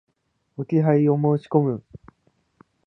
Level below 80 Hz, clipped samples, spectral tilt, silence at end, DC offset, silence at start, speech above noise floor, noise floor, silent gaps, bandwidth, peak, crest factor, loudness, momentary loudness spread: -62 dBFS; under 0.1%; -11.5 dB/octave; 1.05 s; under 0.1%; 0.6 s; 52 dB; -72 dBFS; none; 5.6 kHz; -4 dBFS; 20 dB; -21 LUFS; 16 LU